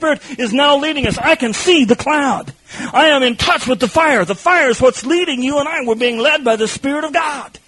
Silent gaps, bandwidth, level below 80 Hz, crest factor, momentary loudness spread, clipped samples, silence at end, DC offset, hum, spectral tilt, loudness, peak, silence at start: none; 11.5 kHz; -44 dBFS; 14 dB; 7 LU; under 0.1%; 0.1 s; under 0.1%; none; -3.5 dB/octave; -14 LUFS; 0 dBFS; 0 s